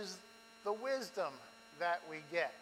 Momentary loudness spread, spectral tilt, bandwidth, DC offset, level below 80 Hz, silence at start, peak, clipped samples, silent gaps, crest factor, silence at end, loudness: 16 LU; -3 dB/octave; 16 kHz; under 0.1%; -88 dBFS; 0 s; -22 dBFS; under 0.1%; none; 20 dB; 0 s; -41 LUFS